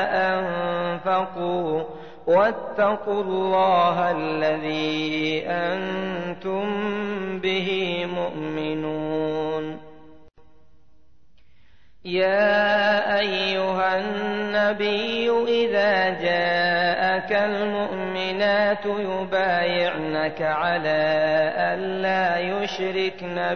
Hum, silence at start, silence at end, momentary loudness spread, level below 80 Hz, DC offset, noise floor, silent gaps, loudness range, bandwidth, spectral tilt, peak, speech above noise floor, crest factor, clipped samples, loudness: none; 0 s; 0 s; 8 LU; -60 dBFS; 0.5%; -62 dBFS; none; 6 LU; 6.6 kHz; -6 dB/octave; -10 dBFS; 39 dB; 14 dB; under 0.1%; -23 LUFS